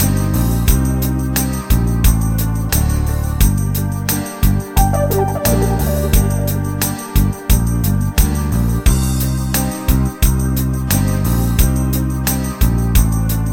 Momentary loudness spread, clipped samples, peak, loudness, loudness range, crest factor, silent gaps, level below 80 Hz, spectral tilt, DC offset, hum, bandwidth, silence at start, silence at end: 3 LU; under 0.1%; 0 dBFS; -16 LUFS; 1 LU; 14 dB; none; -18 dBFS; -5.5 dB/octave; 0.4%; none; 17 kHz; 0 s; 0 s